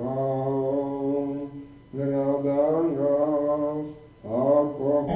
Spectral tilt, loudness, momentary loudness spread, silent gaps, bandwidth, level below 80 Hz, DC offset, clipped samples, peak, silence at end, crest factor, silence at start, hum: -12.5 dB/octave; -25 LUFS; 13 LU; none; 4 kHz; -56 dBFS; under 0.1%; under 0.1%; -10 dBFS; 0 s; 16 dB; 0 s; none